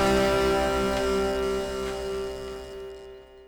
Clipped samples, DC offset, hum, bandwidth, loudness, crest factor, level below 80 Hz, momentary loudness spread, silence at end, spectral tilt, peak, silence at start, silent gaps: under 0.1%; under 0.1%; none; over 20 kHz; -26 LUFS; 16 dB; -40 dBFS; 17 LU; 0 s; -4.5 dB/octave; -12 dBFS; 0 s; none